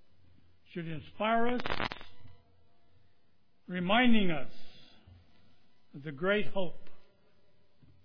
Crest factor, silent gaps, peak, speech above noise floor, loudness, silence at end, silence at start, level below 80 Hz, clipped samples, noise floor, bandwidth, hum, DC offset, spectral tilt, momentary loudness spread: 18 dB; none; -12 dBFS; 45 dB; -32 LUFS; 1 s; 0.75 s; -54 dBFS; under 0.1%; -73 dBFS; 5.4 kHz; none; under 0.1%; -7.5 dB/octave; 19 LU